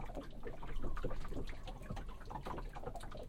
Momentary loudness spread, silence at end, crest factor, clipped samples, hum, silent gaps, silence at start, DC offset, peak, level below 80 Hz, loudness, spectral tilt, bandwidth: 4 LU; 0 s; 16 dB; under 0.1%; none; none; 0 s; under 0.1%; -26 dBFS; -44 dBFS; -48 LUFS; -6.5 dB/octave; 9.8 kHz